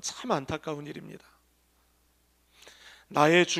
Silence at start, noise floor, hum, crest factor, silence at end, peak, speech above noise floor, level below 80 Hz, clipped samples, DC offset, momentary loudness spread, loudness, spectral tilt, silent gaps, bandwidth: 0.05 s; -68 dBFS; 60 Hz at -70 dBFS; 26 dB; 0 s; -6 dBFS; 40 dB; -64 dBFS; under 0.1%; under 0.1%; 29 LU; -28 LUFS; -4 dB/octave; none; 15 kHz